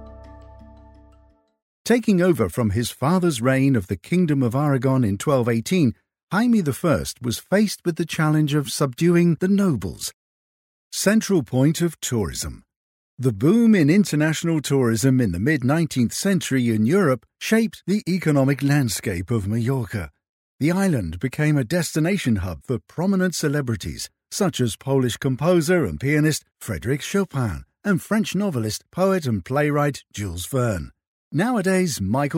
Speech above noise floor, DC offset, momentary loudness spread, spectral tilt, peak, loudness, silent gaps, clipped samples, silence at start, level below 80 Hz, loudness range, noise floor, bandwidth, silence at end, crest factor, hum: 36 dB; under 0.1%; 9 LU; -6 dB/octave; -4 dBFS; -21 LUFS; 1.62-1.85 s, 6.23-6.27 s, 10.13-10.91 s, 12.76-13.17 s, 20.29-20.59 s, 31.07-31.31 s; under 0.1%; 0 s; -48 dBFS; 3 LU; -56 dBFS; 16.5 kHz; 0 s; 16 dB; none